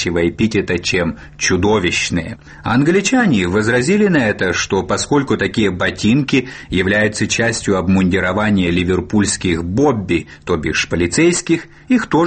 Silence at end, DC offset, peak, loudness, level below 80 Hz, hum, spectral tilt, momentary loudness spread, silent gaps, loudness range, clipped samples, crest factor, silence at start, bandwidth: 0 s; under 0.1%; -2 dBFS; -16 LUFS; -38 dBFS; none; -5 dB/octave; 6 LU; none; 1 LU; under 0.1%; 12 dB; 0 s; 8.8 kHz